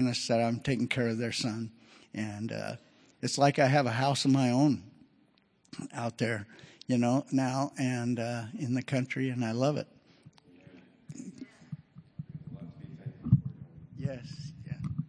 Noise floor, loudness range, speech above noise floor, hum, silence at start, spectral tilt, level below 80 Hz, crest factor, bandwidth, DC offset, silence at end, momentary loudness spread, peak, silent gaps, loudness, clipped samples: -67 dBFS; 8 LU; 38 dB; none; 0 s; -6 dB/octave; -62 dBFS; 22 dB; 11 kHz; under 0.1%; 0 s; 20 LU; -10 dBFS; none; -31 LUFS; under 0.1%